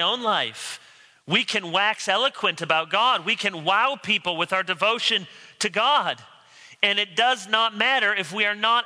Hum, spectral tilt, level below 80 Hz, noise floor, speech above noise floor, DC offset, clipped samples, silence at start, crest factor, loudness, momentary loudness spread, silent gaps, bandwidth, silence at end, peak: none; -2 dB/octave; -78 dBFS; -50 dBFS; 27 dB; under 0.1%; under 0.1%; 0 s; 20 dB; -22 LUFS; 6 LU; none; 11 kHz; 0 s; -4 dBFS